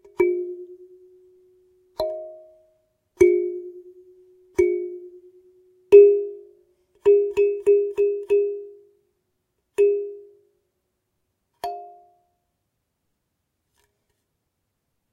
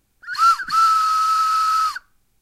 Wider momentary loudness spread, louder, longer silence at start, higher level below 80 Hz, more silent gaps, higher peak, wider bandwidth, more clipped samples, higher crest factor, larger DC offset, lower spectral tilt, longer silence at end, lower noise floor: first, 21 LU vs 9 LU; second, -20 LUFS vs -17 LUFS; about the same, 0.2 s vs 0.25 s; about the same, -60 dBFS vs -58 dBFS; neither; first, -2 dBFS vs -6 dBFS; second, 9.2 kHz vs 15.5 kHz; neither; first, 22 dB vs 12 dB; neither; first, -6 dB/octave vs 2.5 dB/octave; first, 3.25 s vs 0.45 s; first, -77 dBFS vs -38 dBFS